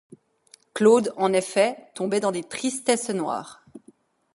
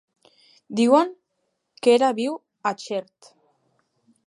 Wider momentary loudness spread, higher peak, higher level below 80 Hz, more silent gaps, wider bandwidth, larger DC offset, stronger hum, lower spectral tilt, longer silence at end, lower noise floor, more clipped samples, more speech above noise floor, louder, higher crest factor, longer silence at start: about the same, 13 LU vs 13 LU; about the same, -4 dBFS vs -4 dBFS; first, -72 dBFS vs -78 dBFS; neither; about the same, 11.5 kHz vs 11.5 kHz; neither; neither; about the same, -4 dB/octave vs -4.5 dB/octave; second, 0.55 s vs 1.25 s; second, -57 dBFS vs -75 dBFS; neither; second, 34 dB vs 55 dB; about the same, -23 LUFS vs -22 LUFS; about the same, 20 dB vs 20 dB; about the same, 0.75 s vs 0.7 s